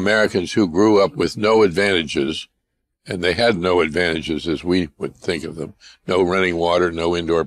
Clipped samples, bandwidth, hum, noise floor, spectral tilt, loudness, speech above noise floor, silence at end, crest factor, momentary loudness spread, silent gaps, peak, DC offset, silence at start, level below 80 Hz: under 0.1%; 12.5 kHz; none; -74 dBFS; -5 dB/octave; -18 LUFS; 56 dB; 0 s; 12 dB; 12 LU; none; -6 dBFS; under 0.1%; 0 s; -46 dBFS